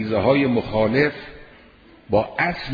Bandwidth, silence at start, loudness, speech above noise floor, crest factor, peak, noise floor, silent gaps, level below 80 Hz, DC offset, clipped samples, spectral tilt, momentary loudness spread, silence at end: 5 kHz; 0 s; -20 LUFS; 29 dB; 16 dB; -4 dBFS; -49 dBFS; none; -46 dBFS; under 0.1%; under 0.1%; -8.5 dB/octave; 8 LU; 0 s